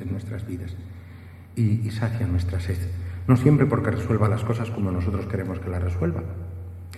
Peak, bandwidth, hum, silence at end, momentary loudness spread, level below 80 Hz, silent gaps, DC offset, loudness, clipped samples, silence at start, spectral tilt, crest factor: -4 dBFS; 13 kHz; none; 0 s; 17 LU; -42 dBFS; none; under 0.1%; -25 LUFS; under 0.1%; 0 s; -8.5 dB/octave; 20 dB